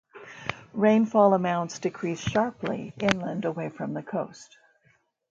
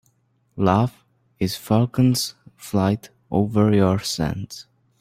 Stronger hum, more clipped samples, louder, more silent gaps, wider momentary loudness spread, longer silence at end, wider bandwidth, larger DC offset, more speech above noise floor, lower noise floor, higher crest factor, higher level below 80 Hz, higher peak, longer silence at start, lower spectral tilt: neither; neither; second, -26 LUFS vs -21 LUFS; neither; about the same, 14 LU vs 14 LU; first, 0.85 s vs 0.4 s; second, 7.8 kHz vs 16 kHz; neither; second, 41 dB vs 45 dB; about the same, -66 dBFS vs -64 dBFS; first, 26 dB vs 20 dB; second, -60 dBFS vs -50 dBFS; about the same, 0 dBFS vs -2 dBFS; second, 0.15 s vs 0.55 s; about the same, -6 dB/octave vs -6 dB/octave